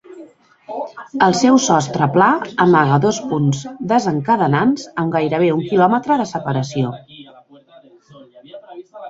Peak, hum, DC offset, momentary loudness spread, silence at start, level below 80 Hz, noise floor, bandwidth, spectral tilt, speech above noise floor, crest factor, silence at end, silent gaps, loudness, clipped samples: 0 dBFS; none; under 0.1%; 15 LU; 0.1 s; -56 dBFS; -47 dBFS; 8 kHz; -5.5 dB/octave; 31 dB; 16 dB; 0 s; none; -16 LUFS; under 0.1%